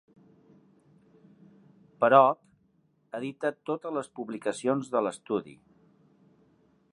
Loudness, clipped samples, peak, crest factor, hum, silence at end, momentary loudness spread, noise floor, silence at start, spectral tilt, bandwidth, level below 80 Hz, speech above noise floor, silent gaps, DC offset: -28 LUFS; under 0.1%; -6 dBFS; 26 dB; none; 1.4 s; 17 LU; -69 dBFS; 2 s; -5.5 dB/octave; 11 kHz; -80 dBFS; 42 dB; none; under 0.1%